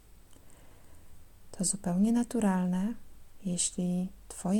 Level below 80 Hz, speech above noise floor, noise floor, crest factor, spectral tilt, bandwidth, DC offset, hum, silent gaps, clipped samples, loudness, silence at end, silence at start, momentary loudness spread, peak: -56 dBFS; 23 dB; -53 dBFS; 16 dB; -5 dB/octave; 16.5 kHz; under 0.1%; none; none; under 0.1%; -31 LUFS; 0 s; 0.3 s; 11 LU; -16 dBFS